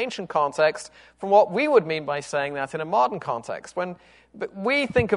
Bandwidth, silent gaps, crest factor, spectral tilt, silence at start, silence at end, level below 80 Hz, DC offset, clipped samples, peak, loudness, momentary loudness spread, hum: 11 kHz; none; 18 dB; -5 dB/octave; 0 s; 0 s; -56 dBFS; under 0.1%; under 0.1%; -4 dBFS; -23 LUFS; 15 LU; none